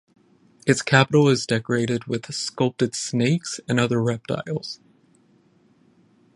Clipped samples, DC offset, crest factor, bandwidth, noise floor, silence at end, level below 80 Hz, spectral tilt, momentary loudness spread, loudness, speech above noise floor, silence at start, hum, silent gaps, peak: under 0.1%; under 0.1%; 24 dB; 11.5 kHz; -59 dBFS; 1.6 s; -60 dBFS; -5 dB/octave; 11 LU; -22 LUFS; 37 dB; 0.65 s; none; none; 0 dBFS